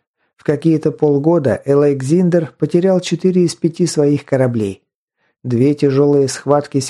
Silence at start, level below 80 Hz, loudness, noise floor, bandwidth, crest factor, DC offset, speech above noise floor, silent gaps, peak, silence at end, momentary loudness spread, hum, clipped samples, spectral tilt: 0.5 s; -58 dBFS; -15 LUFS; -67 dBFS; 12.5 kHz; 14 dB; under 0.1%; 53 dB; 4.95-5.08 s; 0 dBFS; 0 s; 4 LU; none; under 0.1%; -7 dB/octave